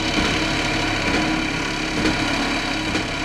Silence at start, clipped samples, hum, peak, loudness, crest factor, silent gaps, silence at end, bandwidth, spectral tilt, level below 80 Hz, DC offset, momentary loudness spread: 0 s; under 0.1%; none; -6 dBFS; -21 LUFS; 14 dB; none; 0 s; 13.5 kHz; -3.5 dB/octave; -34 dBFS; under 0.1%; 3 LU